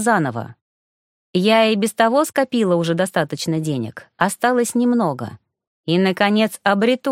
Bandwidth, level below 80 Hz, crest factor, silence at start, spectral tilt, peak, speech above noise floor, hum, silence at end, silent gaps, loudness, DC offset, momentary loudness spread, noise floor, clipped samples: 16.5 kHz; -66 dBFS; 18 dB; 0 s; -5 dB/octave; 0 dBFS; over 72 dB; none; 0 s; 0.61-1.34 s, 5.67-5.84 s; -18 LUFS; under 0.1%; 10 LU; under -90 dBFS; under 0.1%